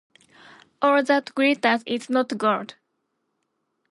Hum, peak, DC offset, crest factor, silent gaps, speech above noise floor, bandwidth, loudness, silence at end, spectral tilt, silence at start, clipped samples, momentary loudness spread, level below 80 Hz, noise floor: none; -6 dBFS; under 0.1%; 20 dB; none; 54 dB; 11.5 kHz; -22 LUFS; 1.2 s; -4.5 dB/octave; 0.8 s; under 0.1%; 6 LU; -78 dBFS; -75 dBFS